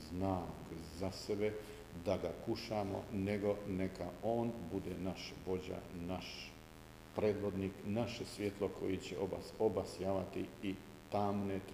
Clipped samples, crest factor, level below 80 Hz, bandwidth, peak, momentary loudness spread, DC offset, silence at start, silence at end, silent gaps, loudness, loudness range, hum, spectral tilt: under 0.1%; 20 dB; -62 dBFS; 15.5 kHz; -20 dBFS; 10 LU; under 0.1%; 0 s; 0 s; none; -41 LUFS; 3 LU; none; -6.5 dB/octave